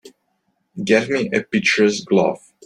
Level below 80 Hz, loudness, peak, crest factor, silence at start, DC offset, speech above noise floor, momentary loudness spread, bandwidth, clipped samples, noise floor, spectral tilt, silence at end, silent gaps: -60 dBFS; -18 LUFS; -2 dBFS; 18 dB; 0.05 s; under 0.1%; 51 dB; 8 LU; 11 kHz; under 0.1%; -69 dBFS; -4.5 dB/octave; 0.3 s; none